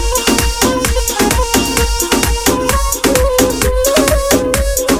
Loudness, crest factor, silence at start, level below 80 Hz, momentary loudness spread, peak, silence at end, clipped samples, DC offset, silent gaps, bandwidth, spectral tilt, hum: -13 LUFS; 12 dB; 0 s; -20 dBFS; 3 LU; 0 dBFS; 0 s; under 0.1%; under 0.1%; none; 19.5 kHz; -3.5 dB/octave; none